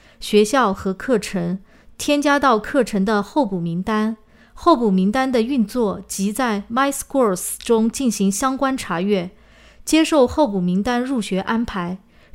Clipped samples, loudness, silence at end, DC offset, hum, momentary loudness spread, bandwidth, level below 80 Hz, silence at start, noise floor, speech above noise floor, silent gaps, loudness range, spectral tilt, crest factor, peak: under 0.1%; -19 LUFS; 0.35 s; under 0.1%; none; 9 LU; 16 kHz; -46 dBFS; 0.2 s; -44 dBFS; 25 dB; none; 1 LU; -5 dB/octave; 18 dB; 0 dBFS